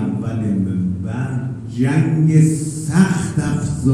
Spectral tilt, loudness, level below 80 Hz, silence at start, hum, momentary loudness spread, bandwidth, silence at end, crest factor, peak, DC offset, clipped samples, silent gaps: -7 dB/octave; -18 LUFS; -44 dBFS; 0 s; none; 9 LU; 12 kHz; 0 s; 16 dB; -2 dBFS; under 0.1%; under 0.1%; none